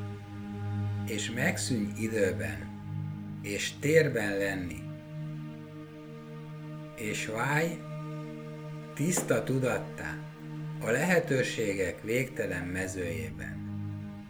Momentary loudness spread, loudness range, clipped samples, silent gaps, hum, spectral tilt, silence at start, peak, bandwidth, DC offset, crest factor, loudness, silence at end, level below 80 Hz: 15 LU; 5 LU; under 0.1%; none; none; -5 dB/octave; 0 s; -10 dBFS; over 20 kHz; under 0.1%; 22 dB; -32 LUFS; 0 s; -58 dBFS